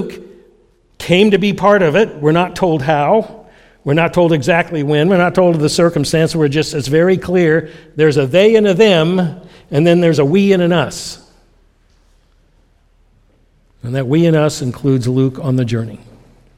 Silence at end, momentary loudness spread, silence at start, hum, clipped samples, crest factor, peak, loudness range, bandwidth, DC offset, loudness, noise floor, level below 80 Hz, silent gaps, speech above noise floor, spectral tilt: 0.6 s; 11 LU; 0 s; none; under 0.1%; 14 dB; 0 dBFS; 7 LU; 14.5 kHz; under 0.1%; -13 LUFS; -53 dBFS; -46 dBFS; none; 40 dB; -6 dB/octave